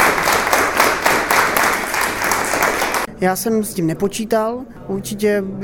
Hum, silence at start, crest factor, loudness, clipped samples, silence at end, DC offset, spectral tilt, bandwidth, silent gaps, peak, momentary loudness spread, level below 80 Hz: none; 0 s; 18 dB; -17 LUFS; under 0.1%; 0 s; under 0.1%; -3 dB/octave; over 20 kHz; none; 0 dBFS; 7 LU; -44 dBFS